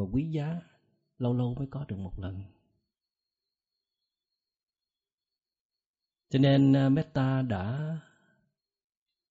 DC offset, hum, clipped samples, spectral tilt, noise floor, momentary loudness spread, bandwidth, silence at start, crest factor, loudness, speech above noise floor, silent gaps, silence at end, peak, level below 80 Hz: under 0.1%; none; under 0.1%; -7.5 dB/octave; under -90 dBFS; 18 LU; 7.6 kHz; 0 s; 20 dB; -29 LUFS; over 62 dB; 4.63-4.67 s, 5.13-5.18 s, 5.60-5.70 s, 5.86-5.94 s; 1.3 s; -12 dBFS; -56 dBFS